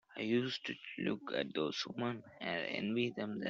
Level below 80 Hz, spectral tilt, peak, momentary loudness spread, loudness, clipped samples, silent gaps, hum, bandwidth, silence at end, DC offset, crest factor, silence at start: -78 dBFS; -3.5 dB/octave; -20 dBFS; 6 LU; -38 LUFS; under 0.1%; none; none; 7.4 kHz; 0 s; under 0.1%; 20 dB; 0.1 s